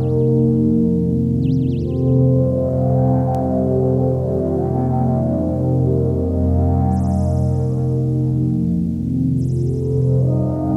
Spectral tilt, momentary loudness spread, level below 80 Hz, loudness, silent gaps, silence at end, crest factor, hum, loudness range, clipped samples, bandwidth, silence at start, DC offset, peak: -11.5 dB/octave; 4 LU; -34 dBFS; -18 LUFS; none; 0 s; 12 dB; none; 2 LU; under 0.1%; 1.8 kHz; 0 s; under 0.1%; -4 dBFS